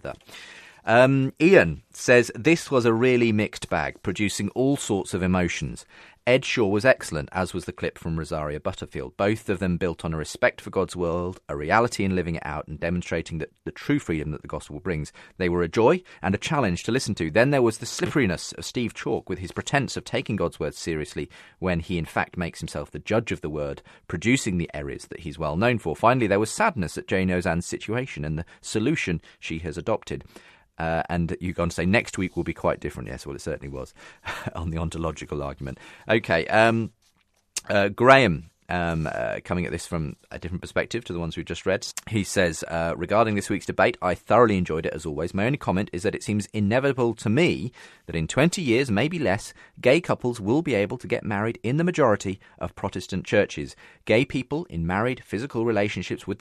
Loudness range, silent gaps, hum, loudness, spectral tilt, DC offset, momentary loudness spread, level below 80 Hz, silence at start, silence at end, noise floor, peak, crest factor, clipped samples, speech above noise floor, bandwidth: 7 LU; none; none; -25 LUFS; -5.5 dB/octave; under 0.1%; 14 LU; -46 dBFS; 0.05 s; 0.05 s; -66 dBFS; 0 dBFS; 24 dB; under 0.1%; 42 dB; 14 kHz